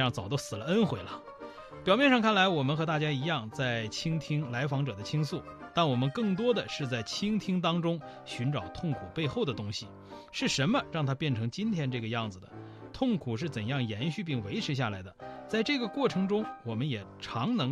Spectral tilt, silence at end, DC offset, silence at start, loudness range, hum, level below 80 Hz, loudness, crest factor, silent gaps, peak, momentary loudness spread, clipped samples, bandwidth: -5.5 dB/octave; 0 s; under 0.1%; 0 s; 5 LU; none; -62 dBFS; -31 LUFS; 20 dB; none; -12 dBFS; 12 LU; under 0.1%; 13 kHz